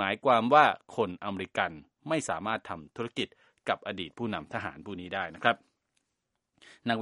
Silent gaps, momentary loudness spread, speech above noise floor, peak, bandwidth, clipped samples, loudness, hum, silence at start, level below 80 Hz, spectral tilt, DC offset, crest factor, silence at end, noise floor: none; 16 LU; 53 dB; -6 dBFS; 11.5 kHz; under 0.1%; -30 LUFS; none; 0 s; -68 dBFS; -4.5 dB/octave; under 0.1%; 24 dB; 0 s; -83 dBFS